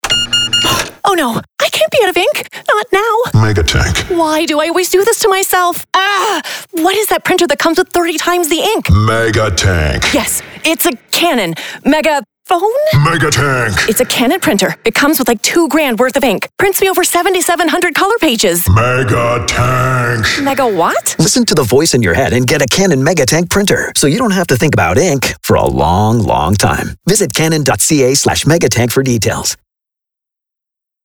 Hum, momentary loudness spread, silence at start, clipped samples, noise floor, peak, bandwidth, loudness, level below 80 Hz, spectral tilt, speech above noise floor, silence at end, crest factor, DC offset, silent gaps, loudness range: none; 4 LU; 0.05 s; under 0.1%; -83 dBFS; 0 dBFS; over 20 kHz; -11 LUFS; -30 dBFS; -4 dB/octave; 72 dB; 1.5 s; 12 dB; 0.3%; none; 1 LU